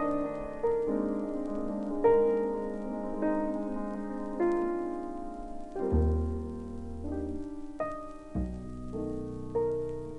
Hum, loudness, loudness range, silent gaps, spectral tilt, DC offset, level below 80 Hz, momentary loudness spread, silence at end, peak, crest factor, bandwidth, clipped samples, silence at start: none; -33 LUFS; 6 LU; none; -9.5 dB/octave; under 0.1%; -42 dBFS; 12 LU; 0 s; -14 dBFS; 18 dB; 10.5 kHz; under 0.1%; 0 s